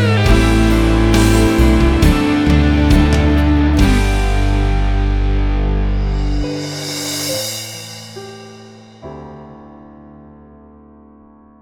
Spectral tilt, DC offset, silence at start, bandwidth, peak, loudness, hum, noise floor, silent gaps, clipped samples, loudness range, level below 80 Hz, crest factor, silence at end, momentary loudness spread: -6 dB/octave; under 0.1%; 0 s; 17.5 kHz; 0 dBFS; -15 LUFS; none; -44 dBFS; none; under 0.1%; 16 LU; -18 dBFS; 14 dB; 1.75 s; 20 LU